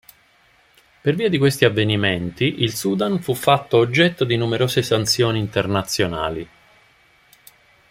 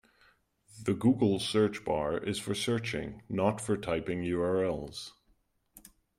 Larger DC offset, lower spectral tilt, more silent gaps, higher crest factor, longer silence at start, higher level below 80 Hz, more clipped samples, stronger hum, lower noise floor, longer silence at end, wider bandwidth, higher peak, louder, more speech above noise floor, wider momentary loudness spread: neither; about the same, -5 dB/octave vs -5.5 dB/octave; neither; about the same, 20 dB vs 20 dB; first, 1.05 s vs 0.75 s; first, -52 dBFS vs -60 dBFS; neither; neither; second, -56 dBFS vs -71 dBFS; first, 1.45 s vs 0.4 s; about the same, 16.5 kHz vs 16 kHz; first, 0 dBFS vs -12 dBFS; first, -19 LUFS vs -31 LUFS; about the same, 37 dB vs 40 dB; second, 6 LU vs 10 LU